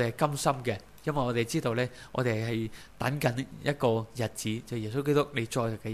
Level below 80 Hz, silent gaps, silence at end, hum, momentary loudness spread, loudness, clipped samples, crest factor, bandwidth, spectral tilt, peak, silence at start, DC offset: -56 dBFS; none; 0 s; none; 7 LU; -31 LUFS; under 0.1%; 20 dB; 15.5 kHz; -5.5 dB/octave; -10 dBFS; 0 s; 0.2%